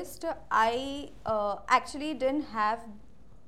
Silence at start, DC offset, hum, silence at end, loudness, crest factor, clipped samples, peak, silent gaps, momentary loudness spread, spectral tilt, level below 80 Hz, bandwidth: 0 s; 0.4%; none; 0.5 s; -30 LUFS; 22 dB; under 0.1%; -10 dBFS; none; 11 LU; -4 dB/octave; -56 dBFS; 16 kHz